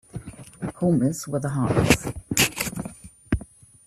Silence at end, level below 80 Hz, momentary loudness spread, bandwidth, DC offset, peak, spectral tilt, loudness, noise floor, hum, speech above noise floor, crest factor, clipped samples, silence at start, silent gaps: 0.4 s; -42 dBFS; 17 LU; 15.5 kHz; under 0.1%; -2 dBFS; -4.5 dB/octave; -24 LUFS; -43 dBFS; none; 21 dB; 24 dB; under 0.1%; 0.15 s; none